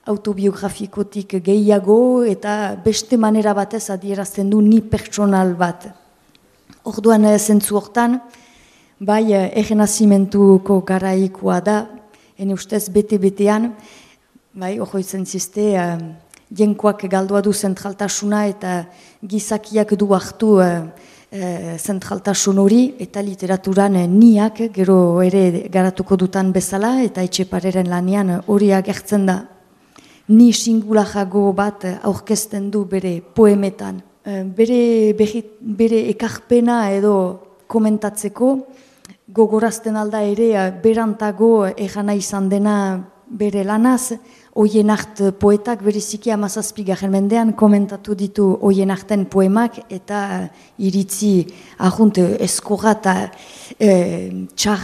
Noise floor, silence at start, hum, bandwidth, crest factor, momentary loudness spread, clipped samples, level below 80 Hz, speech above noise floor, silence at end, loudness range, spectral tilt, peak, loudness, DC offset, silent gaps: -54 dBFS; 0.05 s; none; 14.5 kHz; 16 dB; 12 LU; under 0.1%; -52 dBFS; 38 dB; 0 s; 4 LU; -6 dB/octave; 0 dBFS; -16 LUFS; under 0.1%; none